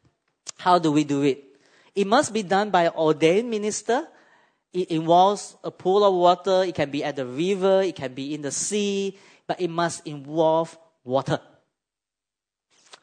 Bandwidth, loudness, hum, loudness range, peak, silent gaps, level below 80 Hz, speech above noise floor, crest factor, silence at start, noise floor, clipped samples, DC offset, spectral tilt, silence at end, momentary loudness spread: 9.6 kHz; -23 LUFS; none; 5 LU; -4 dBFS; none; -72 dBFS; 67 dB; 18 dB; 0.45 s; -89 dBFS; under 0.1%; under 0.1%; -4.5 dB/octave; 1.65 s; 13 LU